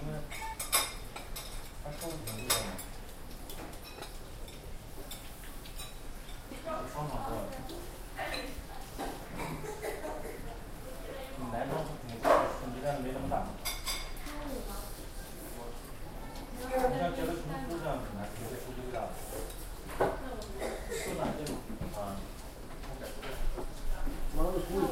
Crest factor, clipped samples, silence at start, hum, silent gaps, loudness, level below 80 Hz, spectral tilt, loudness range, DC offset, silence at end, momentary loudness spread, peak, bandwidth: 24 dB; under 0.1%; 0 s; none; none; -38 LUFS; -42 dBFS; -4 dB/octave; 8 LU; under 0.1%; 0 s; 14 LU; -12 dBFS; 16 kHz